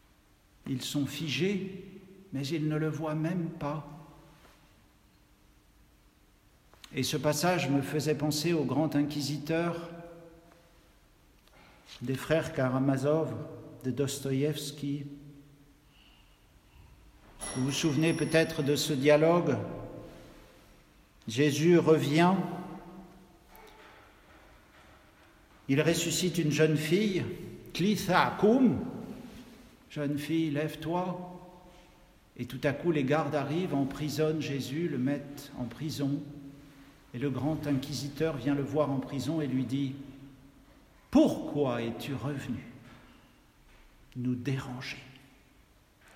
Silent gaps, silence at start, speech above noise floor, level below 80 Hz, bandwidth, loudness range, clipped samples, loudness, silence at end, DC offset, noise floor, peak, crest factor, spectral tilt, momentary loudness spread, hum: none; 0.65 s; 34 dB; -60 dBFS; 16 kHz; 10 LU; under 0.1%; -30 LUFS; 1.05 s; under 0.1%; -63 dBFS; -10 dBFS; 22 dB; -5.5 dB/octave; 19 LU; none